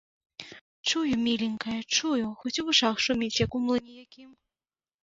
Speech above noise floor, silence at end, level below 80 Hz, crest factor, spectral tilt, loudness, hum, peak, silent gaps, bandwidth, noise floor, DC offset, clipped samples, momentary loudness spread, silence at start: over 62 dB; 0.7 s; -56 dBFS; 20 dB; -3 dB/octave; -27 LUFS; none; -10 dBFS; 0.61-0.84 s; 7.8 kHz; under -90 dBFS; under 0.1%; under 0.1%; 21 LU; 0.4 s